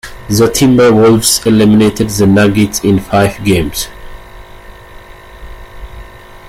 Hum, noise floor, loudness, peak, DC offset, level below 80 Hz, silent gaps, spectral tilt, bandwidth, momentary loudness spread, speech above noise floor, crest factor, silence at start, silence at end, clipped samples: none; -33 dBFS; -9 LUFS; 0 dBFS; under 0.1%; -32 dBFS; none; -5 dB/octave; 16.5 kHz; 7 LU; 24 dB; 12 dB; 0.05 s; 0.1 s; under 0.1%